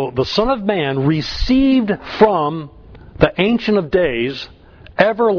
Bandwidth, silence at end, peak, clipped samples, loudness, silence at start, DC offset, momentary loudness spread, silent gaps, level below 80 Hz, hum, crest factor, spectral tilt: 5.4 kHz; 0 s; 0 dBFS; under 0.1%; -16 LUFS; 0 s; under 0.1%; 12 LU; none; -34 dBFS; none; 16 dB; -7 dB/octave